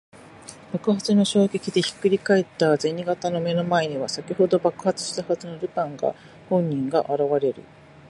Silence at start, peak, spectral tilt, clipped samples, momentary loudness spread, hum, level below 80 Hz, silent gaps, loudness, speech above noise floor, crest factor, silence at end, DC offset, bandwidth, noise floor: 0.35 s; -6 dBFS; -5.5 dB/octave; under 0.1%; 8 LU; none; -64 dBFS; none; -23 LUFS; 21 dB; 18 dB; 0.5 s; under 0.1%; 11.5 kHz; -44 dBFS